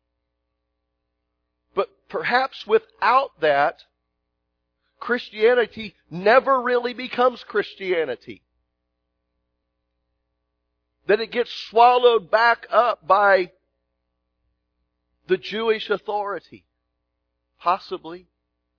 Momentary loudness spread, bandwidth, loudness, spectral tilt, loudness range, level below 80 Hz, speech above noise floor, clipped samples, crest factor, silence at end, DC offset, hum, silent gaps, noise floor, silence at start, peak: 13 LU; 5.4 kHz; -21 LUFS; -5.5 dB/octave; 9 LU; -66 dBFS; 56 dB; under 0.1%; 22 dB; 0.6 s; under 0.1%; 60 Hz at -60 dBFS; none; -77 dBFS; 1.75 s; -2 dBFS